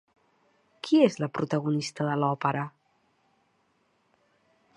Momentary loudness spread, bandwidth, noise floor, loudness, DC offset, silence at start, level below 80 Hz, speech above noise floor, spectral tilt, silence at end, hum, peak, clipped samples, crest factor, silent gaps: 11 LU; 11 kHz; -70 dBFS; -27 LUFS; under 0.1%; 0.85 s; -76 dBFS; 44 dB; -6.5 dB/octave; 2.05 s; none; -8 dBFS; under 0.1%; 22 dB; none